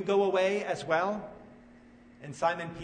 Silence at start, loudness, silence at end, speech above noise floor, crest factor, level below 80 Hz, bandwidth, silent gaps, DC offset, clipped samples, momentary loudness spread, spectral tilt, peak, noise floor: 0 s; -30 LUFS; 0 s; 26 dB; 18 dB; -66 dBFS; 9.6 kHz; none; under 0.1%; under 0.1%; 19 LU; -5 dB/octave; -14 dBFS; -55 dBFS